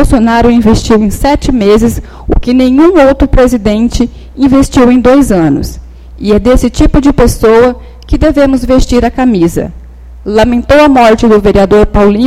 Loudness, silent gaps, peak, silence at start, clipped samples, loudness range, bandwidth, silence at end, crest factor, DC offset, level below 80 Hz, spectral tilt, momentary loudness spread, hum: -7 LUFS; none; 0 dBFS; 0 s; 3%; 2 LU; 15.5 kHz; 0 s; 6 dB; under 0.1%; -16 dBFS; -6.5 dB/octave; 9 LU; none